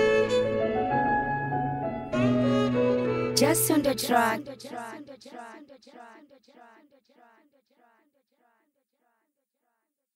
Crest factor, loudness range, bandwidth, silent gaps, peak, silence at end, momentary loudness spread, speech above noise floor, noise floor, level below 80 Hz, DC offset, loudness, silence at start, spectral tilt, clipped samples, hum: 22 dB; 17 LU; 16 kHz; none; -6 dBFS; 4.05 s; 20 LU; 53 dB; -80 dBFS; -56 dBFS; under 0.1%; -25 LUFS; 0 s; -4.5 dB/octave; under 0.1%; none